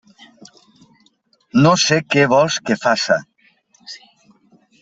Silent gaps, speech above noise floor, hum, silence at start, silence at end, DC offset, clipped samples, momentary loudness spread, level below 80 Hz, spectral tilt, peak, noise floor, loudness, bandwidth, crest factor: none; 44 dB; none; 1.55 s; 0.85 s; under 0.1%; under 0.1%; 23 LU; -60 dBFS; -4.5 dB/octave; -2 dBFS; -60 dBFS; -15 LUFS; 8.2 kHz; 16 dB